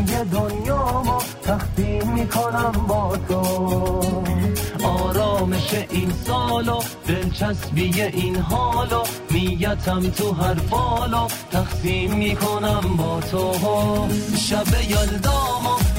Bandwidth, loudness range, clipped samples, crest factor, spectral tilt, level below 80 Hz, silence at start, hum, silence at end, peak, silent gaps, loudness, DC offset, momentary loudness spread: 16 kHz; 1 LU; under 0.1%; 12 dB; -5.5 dB/octave; -30 dBFS; 0 s; none; 0 s; -8 dBFS; none; -21 LUFS; under 0.1%; 3 LU